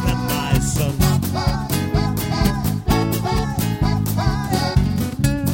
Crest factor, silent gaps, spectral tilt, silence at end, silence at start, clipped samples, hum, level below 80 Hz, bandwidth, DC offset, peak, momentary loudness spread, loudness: 16 dB; none; -5.5 dB/octave; 0 s; 0 s; under 0.1%; none; -28 dBFS; 17 kHz; under 0.1%; -2 dBFS; 3 LU; -20 LUFS